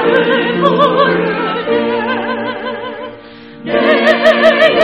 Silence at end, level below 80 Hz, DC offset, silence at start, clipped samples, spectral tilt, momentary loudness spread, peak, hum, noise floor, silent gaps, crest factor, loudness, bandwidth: 0 s; -52 dBFS; 0.2%; 0 s; 0.3%; -6 dB/octave; 14 LU; 0 dBFS; none; -34 dBFS; none; 12 dB; -12 LUFS; 9.8 kHz